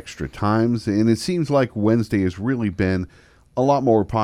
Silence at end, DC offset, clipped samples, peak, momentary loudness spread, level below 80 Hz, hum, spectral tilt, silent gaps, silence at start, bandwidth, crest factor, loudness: 0 s; under 0.1%; under 0.1%; -6 dBFS; 7 LU; -46 dBFS; none; -7 dB/octave; none; 0.05 s; 14 kHz; 14 dB; -20 LUFS